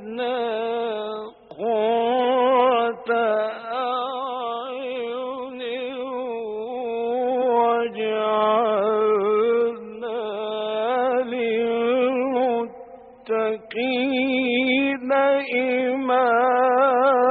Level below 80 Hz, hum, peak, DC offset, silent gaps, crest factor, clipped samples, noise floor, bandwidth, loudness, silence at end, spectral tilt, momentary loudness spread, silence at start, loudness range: -70 dBFS; none; -6 dBFS; under 0.1%; none; 16 dB; under 0.1%; -43 dBFS; 4.7 kHz; -22 LUFS; 0 s; -1.5 dB/octave; 11 LU; 0 s; 5 LU